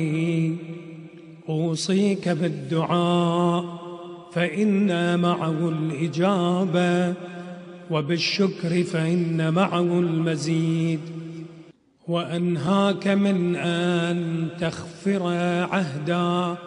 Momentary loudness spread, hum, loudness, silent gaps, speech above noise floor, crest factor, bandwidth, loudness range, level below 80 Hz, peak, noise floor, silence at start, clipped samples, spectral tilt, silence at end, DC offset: 15 LU; none; -23 LUFS; none; 27 dB; 18 dB; 10.5 kHz; 2 LU; -66 dBFS; -6 dBFS; -50 dBFS; 0 s; under 0.1%; -6.5 dB/octave; 0 s; under 0.1%